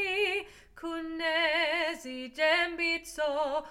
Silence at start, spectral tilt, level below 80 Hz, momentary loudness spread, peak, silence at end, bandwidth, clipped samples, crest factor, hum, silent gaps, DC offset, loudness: 0 s; -1.5 dB/octave; -62 dBFS; 13 LU; -12 dBFS; 0 s; 16 kHz; under 0.1%; 18 dB; none; none; under 0.1%; -29 LUFS